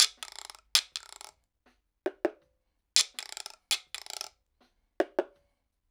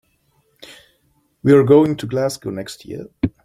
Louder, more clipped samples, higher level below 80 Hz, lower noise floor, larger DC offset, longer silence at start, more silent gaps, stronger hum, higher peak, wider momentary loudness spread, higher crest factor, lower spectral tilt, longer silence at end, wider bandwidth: second, -31 LUFS vs -16 LUFS; neither; second, -76 dBFS vs -50 dBFS; first, -76 dBFS vs -62 dBFS; neither; second, 0 s vs 1.45 s; neither; neither; about the same, -2 dBFS vs -2 dBFS; about the same, 19 LU vs 20 LU; first, 34 dB vs 18 dB; second, 1.5 dB/octave vs -7 dB/octave; first, 0.65 s vs 0.15 s; first, over 20 kHz vs 15 kHz